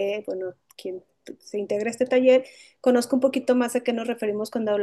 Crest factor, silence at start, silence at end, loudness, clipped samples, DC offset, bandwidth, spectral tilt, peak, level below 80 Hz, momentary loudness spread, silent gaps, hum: 16 dB; 0 s; 0 s; -24 LUFS; under 0.1%; under 0.1%; 12.5 kHz; -4.5 dB/octave; -8 dBFS; -74 dBFS; 16 LU; none; none